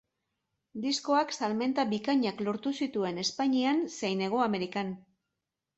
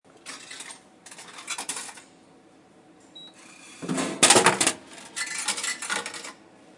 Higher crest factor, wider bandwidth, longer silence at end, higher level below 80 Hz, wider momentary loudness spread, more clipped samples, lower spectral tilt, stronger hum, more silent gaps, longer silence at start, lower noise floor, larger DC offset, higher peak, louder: second, 16 dB vs 26 dB; second, 8.2 kHz vs 11.5 kHz; first, 0.8 s vs 0.45 s; about the same, -74 dBFS vs -72 dBFS; second, 7 LU vs 28 LU; neither; first, -4.5 dB/octave vs -1 dB/octave; neither; neither; first, 0.75 s vs 0.25 s; first, -87 dBFS vs -55 dBFS; neither; second, -14 dBFS vs -4 dBFS; second, -30 LUFS vs -23 LUFS